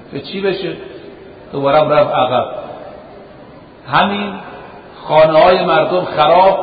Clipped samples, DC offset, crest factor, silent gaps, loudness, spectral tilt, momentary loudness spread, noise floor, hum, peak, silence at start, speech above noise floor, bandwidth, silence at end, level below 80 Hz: under 0.1%; under 0.1%; 14 dB; none; -13 LUFS; -11 dB/octave; 23 LU; -38 dBFS; none; 0 dBFS; 0 s; 25 dB; 5 kHz; 0 s; -48 dBFS